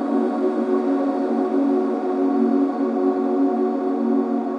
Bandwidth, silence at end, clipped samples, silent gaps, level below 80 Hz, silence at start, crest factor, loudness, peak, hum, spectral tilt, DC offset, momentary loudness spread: 5.8 kHz; 0 s; under 0.1%; none; -72 dBFS; 0 s; 12 dB; -21 LUFS; -8 dBFS; none; -8 dB/octave; under 0.1%; 2 LU